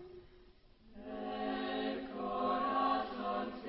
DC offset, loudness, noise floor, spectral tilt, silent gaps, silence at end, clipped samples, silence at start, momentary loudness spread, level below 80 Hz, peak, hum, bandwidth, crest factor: under 0.1%; -37 LUFS; -62 dBFS; -2.5 dB/octave; none; 0 s; under 0.1%; 0 s; 16 LU; -64 dBFS; -22 dBFS; none; 5.6 kHz; 18 dB